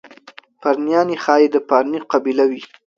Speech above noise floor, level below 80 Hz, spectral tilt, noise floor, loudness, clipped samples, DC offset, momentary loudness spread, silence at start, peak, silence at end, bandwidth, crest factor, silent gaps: 28 dB; -70 dBFS; -5.5 dB/octave; -44 dBFS; -17 LUFS; under 0.1%; under 0.1%; 6 LU; 0.05 s; 0 dBFS; 0.3 s; 7.2 kHz; 18 dB; none